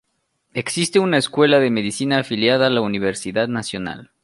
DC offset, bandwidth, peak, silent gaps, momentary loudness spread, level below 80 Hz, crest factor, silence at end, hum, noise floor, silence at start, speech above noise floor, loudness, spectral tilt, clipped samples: under 0.1%; 11.5 kHz; -2 dBFS; none; 12 LU; -56 dBFS; 16 dB; 0.2 s; none; -70 dBFS; 0.55 s; 52 dB; -19 LUFS; -4.5 dB/octave; under 0.1%